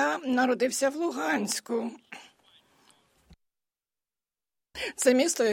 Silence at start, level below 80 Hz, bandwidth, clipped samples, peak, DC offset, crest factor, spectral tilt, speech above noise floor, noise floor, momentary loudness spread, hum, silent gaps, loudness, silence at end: 0 s; -70 dBFS; 16.5 kHz; under 0.1%; -8 dBFS; under 0.1%; 22 dB; -2.5 dB/octave; over 63 dB; under -90 dBFS; 21 LU; none; none; -27 LUFS; 0 s